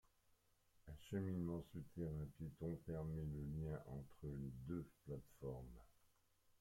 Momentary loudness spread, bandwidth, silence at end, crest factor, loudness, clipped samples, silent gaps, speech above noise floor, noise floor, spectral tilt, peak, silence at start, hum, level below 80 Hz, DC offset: 10 LU; 16.5 kHz; 0.1 s; 16 dB; -50 LUFS; under 0.1%; none; 29 dB; -78 dBFS; -9 dB/octave; -34 dBFS; 0.85 s; none; -64 dBFS; under 0.1%